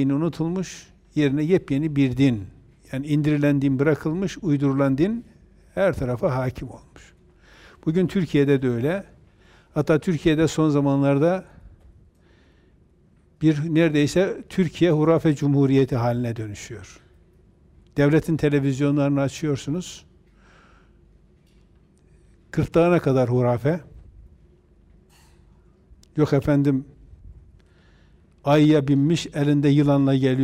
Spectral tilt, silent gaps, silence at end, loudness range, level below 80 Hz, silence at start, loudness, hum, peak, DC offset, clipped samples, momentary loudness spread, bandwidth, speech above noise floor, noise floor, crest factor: -7.5 dB/octave; none; 0 s; 5 LU; -48 dBFS; 0 s; -21 LUFS; none; -8 dBFS; under 0.1%; under 0.1%; 12 LU; 13 kHz; 37 dB; -57 dBFS; 16 dB